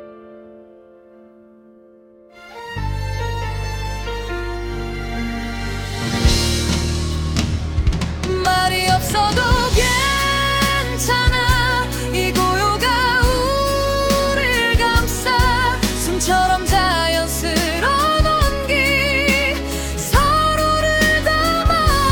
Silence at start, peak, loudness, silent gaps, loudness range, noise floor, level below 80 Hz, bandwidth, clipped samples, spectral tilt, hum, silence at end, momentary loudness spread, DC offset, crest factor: 0 s; -4 dBFS; -17 LUFS; none; 10 LU; -47 dBFS; -26 dBFS; 18 kHz; under 0.1%; -4 dB/octave; none; 0 s; 10 LU; under 0.1%; 14 dB